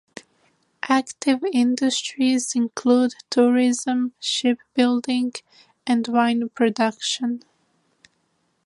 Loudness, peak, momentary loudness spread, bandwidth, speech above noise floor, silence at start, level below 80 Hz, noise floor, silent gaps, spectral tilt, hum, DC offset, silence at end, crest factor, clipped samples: -21 LUFS; -4 dBFS; 6 LU; 11.5 kHz; 48 dB; 0.85 s; -76 dBFS; -69 dBFS; none; -3 dB/octave; none; under 0.1%; 1.25 s; 18 dB; under 0.1%